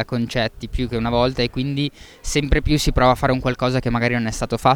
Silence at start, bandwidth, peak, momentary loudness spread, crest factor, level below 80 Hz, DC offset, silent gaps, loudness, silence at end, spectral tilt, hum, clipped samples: 0 s; 18 kHz; -2 dBFS; 8 LU; 18 dB; -30 dBFS; under 0.1%; none; -20 LUFS; 0 s; -5.5 dB/octave; none; under 0.1%